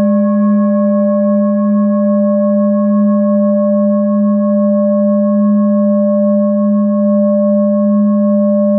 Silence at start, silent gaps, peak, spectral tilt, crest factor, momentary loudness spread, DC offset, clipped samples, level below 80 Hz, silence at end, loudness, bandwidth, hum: 0 s; none; -4 dBFS; -16 dB/octave; 6 dB; 1 LU; under 0.1%; under 0.1%; -82 dBFS; 0 s; -12 LUFS; 1.8 kHz; none